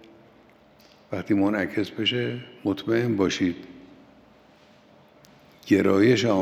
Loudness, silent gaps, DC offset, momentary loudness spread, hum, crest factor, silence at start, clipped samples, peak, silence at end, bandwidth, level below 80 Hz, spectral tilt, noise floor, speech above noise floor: -24 LUFS; none; under 0.1%; 16 LU; none; 18 dB; 1.1 s; under 0.1%; -6 dBFS; 0 s; 14.5 kHz; -68 dBFS; -5.5 dB/octave; -55 dBFS; 32 dB